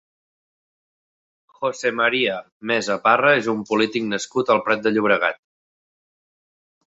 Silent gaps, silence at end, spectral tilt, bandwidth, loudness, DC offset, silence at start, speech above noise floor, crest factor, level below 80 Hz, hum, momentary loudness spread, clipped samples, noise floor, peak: 2.52-2.60 s; 1.55 s; -4 dB/octave; 8 kHz; -20 LUFS; under 0.1%; 1.6 s; over 70 dB; 20 dB; -66 dBFS; none; 8 LU; under 0.1%; under -90 dBFS; -2 dBFS